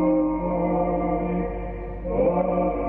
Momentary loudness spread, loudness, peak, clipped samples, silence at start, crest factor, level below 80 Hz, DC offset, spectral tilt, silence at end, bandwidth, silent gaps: 10 LU; -24 LUFS; -12 dBFS; under 0.1%; 0 s; 12 dB; -36 dBFS; under 0.1%; -12.5 dB/octave; 0 s; 3.2 kHz; none